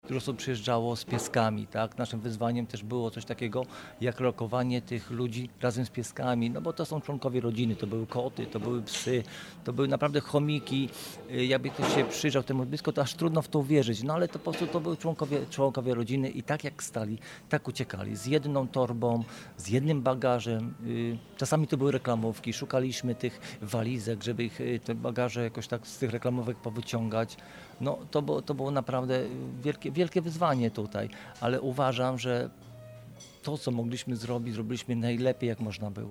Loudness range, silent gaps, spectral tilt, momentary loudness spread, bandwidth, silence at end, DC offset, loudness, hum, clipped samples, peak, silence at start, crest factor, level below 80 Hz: 4 LU; none; -6 dB/octave; 8 LU; 16.5 kHz; 0 s; under 0.1%; -31 LUFS; none; under 0.1%; -12 dBFS; 0.05 s; 20 dB; -64 dBFS